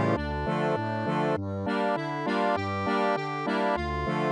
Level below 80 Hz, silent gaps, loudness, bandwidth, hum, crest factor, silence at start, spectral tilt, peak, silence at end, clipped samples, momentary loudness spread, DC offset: -46 dBFS; none; -28 LUFS; 11 kHz; none; 14 dB; 0 s; -7 dB/octave; -14 dBFS; 0 s; under 0.1%; 3 LU; under 0.1%